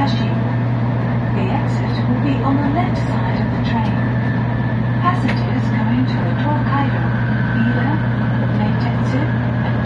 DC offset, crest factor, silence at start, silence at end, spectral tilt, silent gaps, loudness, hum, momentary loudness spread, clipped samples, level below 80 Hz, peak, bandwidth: under 0.1%; 14 dB; 0 s; 0 s; -8.5 dB/octave; none; -18 LUFS; none; 2 LU; under 0.1%; -34 dBFS; -2 dBFS; 6.6 kHz